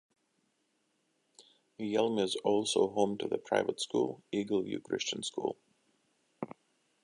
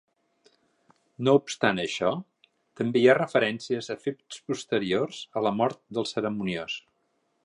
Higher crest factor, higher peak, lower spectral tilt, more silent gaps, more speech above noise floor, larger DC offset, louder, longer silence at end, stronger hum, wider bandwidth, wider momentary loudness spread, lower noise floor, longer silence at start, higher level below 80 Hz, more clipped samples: about the same, 22 dB vs 22 dB; second, -12 dBFS vs -6 dBFS; about the same, -4 dB/octave vs -5 dB/octave; neither; about the same, 45 dB vs 47 dB; neither; second, -33 LUFS vs -27 LUFS; second, 0.5 s vs 0.65 s; neither; about the same, 11.5 kHz vs 11 kHz; about the same, 14 LU vs 12 LU; first, -77 dBFS vs -73 dBFS; first, 1.4 s vs 1.2 s; second, -76 dBFS vs -68 dBFS; neither